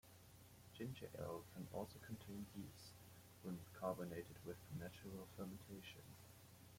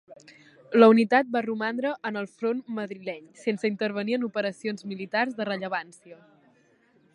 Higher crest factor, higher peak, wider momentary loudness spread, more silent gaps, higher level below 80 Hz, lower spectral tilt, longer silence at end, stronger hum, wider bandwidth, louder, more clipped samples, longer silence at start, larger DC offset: about the same, 22 dB vs 24 dB; second, -32 dBFS vs -2 dBFS; about the same, 14 LU vs 16 LU; neither; first, -76 dBFS vs -82 dBFS; about the same, -6 dB/octave vs -6 dB/octave; second, 0 s vs 1 s; neither; first, 16.5 kHz vs 11 kHz; second, -54 LUFS vs -26 LUFS; neither; about the same, 0.05 s vs 0.1 s; neither